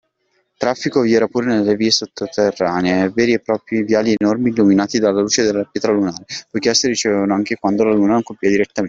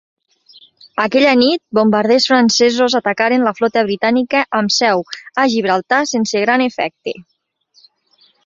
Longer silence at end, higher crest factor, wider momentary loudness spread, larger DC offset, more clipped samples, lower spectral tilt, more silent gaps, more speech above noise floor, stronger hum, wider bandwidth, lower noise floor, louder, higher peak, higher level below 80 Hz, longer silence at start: second, 0 s vs 1.25 s; about the same, 14 dB vs 14 dB; second, 5 LU vs 9 LU; neither; neither; about the same, -4.5 dB/octave vs -3.5 dB/octave; neither; first, 49 dB vs 42 dB; neither; about the same, 7.8 kHz vs 7.6 kHz; first, -65 dBFS vs -56 dBFS; about the same, -16 LUFS vs -14 LUFS; about the same, -2 dBFS vs -2 dBFS; about the same, -56 dBFS vs -60 dBFS; second, 0.6 s vs 0.95 s